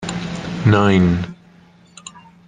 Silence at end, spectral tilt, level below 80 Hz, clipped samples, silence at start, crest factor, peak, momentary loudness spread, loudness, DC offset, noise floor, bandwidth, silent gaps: 0.3 s; -7 dB/octave; -46 dBFS; under 0.1%; 0 s; 16 dB; -2 dBFS; 25 LU; -17 LUFS; under 0.1%; -48 dBFS; 9.4 kHz; none